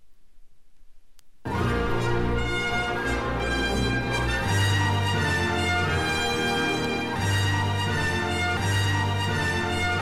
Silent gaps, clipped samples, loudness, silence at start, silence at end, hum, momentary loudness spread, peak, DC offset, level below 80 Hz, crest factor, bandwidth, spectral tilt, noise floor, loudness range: none; under 0.1%; -25 LUFS; 0.4 s; 0 s; none; 3 LU; -12 dBFS; 0.6%; -38 dBFS; 14 dB; 15 kHz; -4.5 dB/octave; -51 dBFS; 3 LU